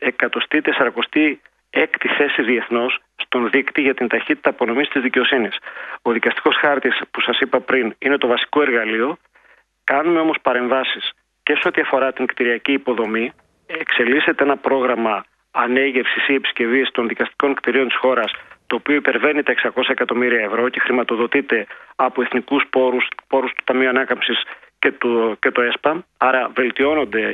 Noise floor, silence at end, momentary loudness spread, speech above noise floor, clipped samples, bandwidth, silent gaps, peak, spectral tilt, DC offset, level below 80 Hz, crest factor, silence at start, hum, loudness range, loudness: -54 dBFS; 0 s; 6 LU; 36 dB; under 0.1%; 4.8 kHz; none; 0 dBFS; -6.5 dB/octave; under 0.1%; -64 dBFS; 18 dB; 0 s; none; 1 LU; -18 LUFS